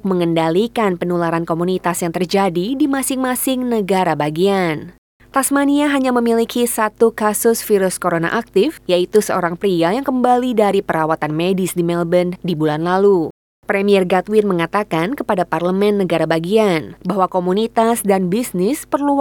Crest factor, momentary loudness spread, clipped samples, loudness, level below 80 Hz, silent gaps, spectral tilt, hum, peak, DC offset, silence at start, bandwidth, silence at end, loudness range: 16 dB; 4 LU; under 0.1%; -17 LUFS; -52 dBFS; 4.98-5.20 s, 13.30-13.63 s; -5 dB/octave; none; 0 dBFS; under 0.1%; 0.05 s; 19.5 kHz; 0 s; 1 LU